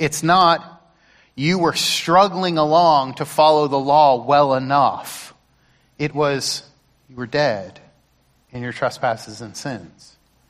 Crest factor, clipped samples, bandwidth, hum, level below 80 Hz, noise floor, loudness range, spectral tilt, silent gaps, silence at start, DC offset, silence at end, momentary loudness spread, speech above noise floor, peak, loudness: 16 dB; under 0.1%; 15.5 kHz; none; -56 dBFS; -60 dBFS; 10 LU; -4.5 dB/octave; none; 0 s; under 0.1%; 0.65 s; 16 LU; 42 dB; -2 dBFS; -17 LUFS